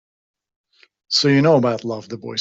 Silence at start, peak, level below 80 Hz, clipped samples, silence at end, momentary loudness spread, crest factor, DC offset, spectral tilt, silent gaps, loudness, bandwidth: 1.1 s; -2 dBFS; -62 dBFS; under 0.1%; 0 s; 14 LU; 18 dB; under 0.1%; -5 dB/octave; none; -17 LUFS; 8 kHz